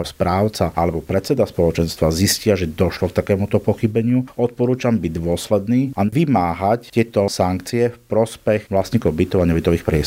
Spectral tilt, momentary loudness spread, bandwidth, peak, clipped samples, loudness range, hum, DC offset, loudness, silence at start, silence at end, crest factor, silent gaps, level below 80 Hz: -6 dB/octave; 4 LU; 16 kHz; -2 dBFS; under 0.1%; 1 LU; none; under 0.1%; -19 LUFS; 0 s; 0 s; 16 dB; none; -38 dBFS